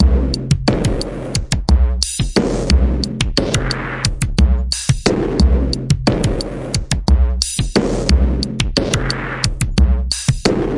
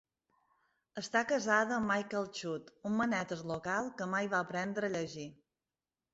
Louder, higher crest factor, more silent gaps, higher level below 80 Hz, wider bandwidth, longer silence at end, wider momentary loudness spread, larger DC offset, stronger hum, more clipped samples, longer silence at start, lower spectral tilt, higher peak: first, -17 LUFS vs -35 LUFS; second, 14 dB vs 22 dB; neither; first, -18 dBFS vs -72 dBFS; first, 11.5 kHz vs 8 kHz; second, 0 s vs 0.8 s; second, 5 LU vs 12 LU; neither; neither; neither; second, 0 s vs 0.95 s; first, -5 dB/octave vs -3.5 dB/octave; first, 0 dBFS vs -14 dBFS